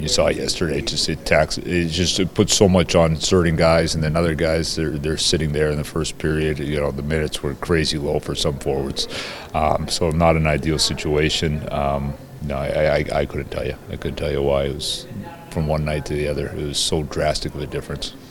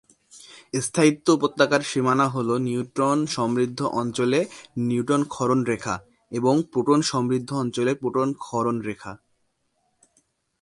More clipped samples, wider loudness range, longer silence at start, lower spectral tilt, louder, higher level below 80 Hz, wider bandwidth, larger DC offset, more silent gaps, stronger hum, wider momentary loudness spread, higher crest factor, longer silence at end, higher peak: neither; first, 6 LU vs 3 LU; second, 0 s vs 0.35 s; about the same, -4.5 dB/octave vs -5.5 dB/octave; first, -20 LUFS vs -23 LUFS; first, -34 dBFS vs -62 dBFS; first, 17.5 kHz vs 11.5 kHz; neither; neither; neither; about the same, 10 LU vs 9 LU; about the same, 20 dB vs 20 dB; second, 0 s vs 1.45 s; first, 0 dBFS vs -4 dBFS